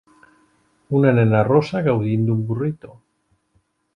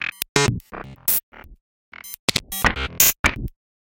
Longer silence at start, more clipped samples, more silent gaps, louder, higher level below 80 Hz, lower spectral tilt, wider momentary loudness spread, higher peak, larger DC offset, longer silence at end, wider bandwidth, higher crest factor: first, 0.9 s vs 0 s; neither; second, none vs 0.29-0.35 s, 1.23-1.32 s, 1.61-1.92 s, 2.19-2.28 s, 3.19-3.24 s; about the same, -19 LUFS vs -20 LUFS; second, -54 dBFS vs -36 dBFS; first, -9.5 dB/octave vs -2 dB/octave; second, 9 LU vs 21 LU; second, -4 dBFS vs 0 dBFS; neither; first, 1.1 s vs 0.35 s; second, 6.8 kHz vs 17.5 kHz; second, 18 dB vs 24 dB